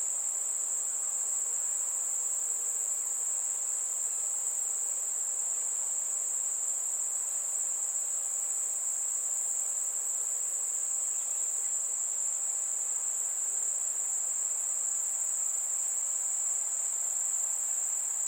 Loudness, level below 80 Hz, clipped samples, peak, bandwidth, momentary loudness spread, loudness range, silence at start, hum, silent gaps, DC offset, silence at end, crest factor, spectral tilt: -29 LUFS; under -90 dBFS; under 0.1%; -18 dBFS; 16.5 kHz; 1 LU; 1 LU; 0 s; none; none; under 0.1%; 0 s; 14 dB; 3.5 dB/octave